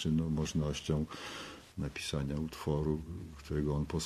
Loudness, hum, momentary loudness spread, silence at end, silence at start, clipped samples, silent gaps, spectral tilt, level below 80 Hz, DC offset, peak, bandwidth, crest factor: -36 LUFS; none; 11 LU; 0 s; 0 s; under 0.1%; none; -6 dB/octave; -46 dBFS; under 0.1%; -20 dBFS; 13.5 kHz; 16 dB